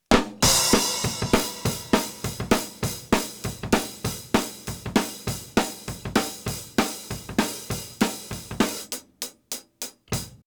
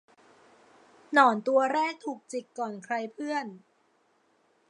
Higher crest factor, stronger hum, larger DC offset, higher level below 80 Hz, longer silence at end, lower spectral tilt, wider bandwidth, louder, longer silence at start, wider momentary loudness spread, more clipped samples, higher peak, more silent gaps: second, 18 dB vs 24 dB; neither; neither; first, -42 dBFS vs -88 dBFS; second, 0.1 s vs 1.1 s; about the same, -3.5 dB/octave vs -4 dB/octave; first, over 20 kHz vs 11 kHz; first, -25 LUFS vs -28 LUFS; second, 0.1 s vs 1.1 s; about the same, 14 LU vs 16 LU; neither; about the same, -8 dBFS vs -6 dBFS; neither